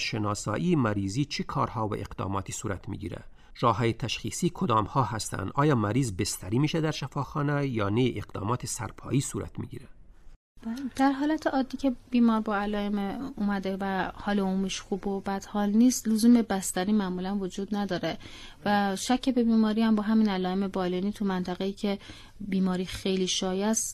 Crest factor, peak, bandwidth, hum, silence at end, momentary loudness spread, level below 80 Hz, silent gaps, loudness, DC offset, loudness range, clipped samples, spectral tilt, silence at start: 18 dB; -10 dBFS; 15 kHz; none; 0 s; 10 LU; -50 dBFS; 10.36-10.55 s; -28 LUFS; under 0.1%; 4 LU; under 0.1%; -5 dB/octave; 0 s